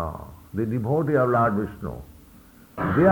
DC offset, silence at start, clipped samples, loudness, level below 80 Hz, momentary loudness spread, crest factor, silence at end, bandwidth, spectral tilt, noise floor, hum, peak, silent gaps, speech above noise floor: under 0.1%; 0 s; under 0.1%; -24 LUFS; -46 dBFS; 19 LU; 18 dB; 0 s; 19.5 kHz; -9.5 dB/octave; -50 dBFS; none; -6 dBFS; none; 28 dB